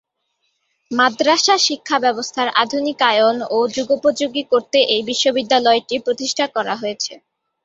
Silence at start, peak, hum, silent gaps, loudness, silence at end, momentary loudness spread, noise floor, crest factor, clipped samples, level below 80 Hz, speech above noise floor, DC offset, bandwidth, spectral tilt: 0.9 s; -2 dBFS; none; none; -17 LUFS; 0.45 s; 8 LU; -70 dBFS; 18 dB; under 0.1%; -64 dBFS; 53 dB; under 0.1%; 8 kHz; -1.5 dB/octave